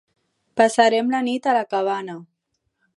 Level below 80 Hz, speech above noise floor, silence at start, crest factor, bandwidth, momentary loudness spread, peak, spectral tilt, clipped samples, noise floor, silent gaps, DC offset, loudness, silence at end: -74 dBFS; 55 dB; 0.55 s; 20 dB; 11.5 kHz; 16 LU; -2 dBFS; -3.5 dB/octave; under 0.1%; -75 dBFS; none; under 0.1%; -20 LUFS; 0.75 s